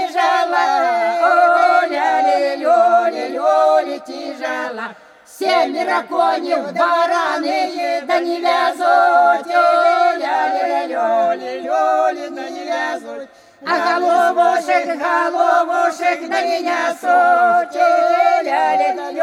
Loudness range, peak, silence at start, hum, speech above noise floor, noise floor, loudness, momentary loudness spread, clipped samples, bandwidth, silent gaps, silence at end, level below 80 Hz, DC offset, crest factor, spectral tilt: 4 LU; -2 dBFS; 0 s; none; 24 dB; -39 dBFS; -16 LUFS; 11 LU; under 0.1%; 13 kHz; none; 0 s; -76 dBFS; under 0.1%; 14 dB; -2.5 dB/octave